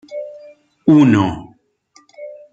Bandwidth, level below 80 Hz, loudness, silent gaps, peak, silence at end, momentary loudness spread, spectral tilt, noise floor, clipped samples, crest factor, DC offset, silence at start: 7.8 kHz; -52 dBFS; -13 LUFS; none; -2 dBFS; 0.2 s; 25 LU; -8 dB/octave; -54 dBFS; under 0.1%; 16 dB; under 0.1%; 0.1 s